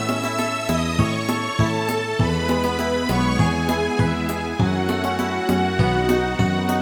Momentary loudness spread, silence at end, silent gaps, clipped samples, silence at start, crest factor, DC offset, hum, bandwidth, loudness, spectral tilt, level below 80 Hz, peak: 3 LU; 0 s; none; under 0.1%; 0 s; 16 dB; under 0.1%; none; 18.5 kHz; -21 LUFS; -5.5 dB/octave; -36 dBFS; -6 dBFS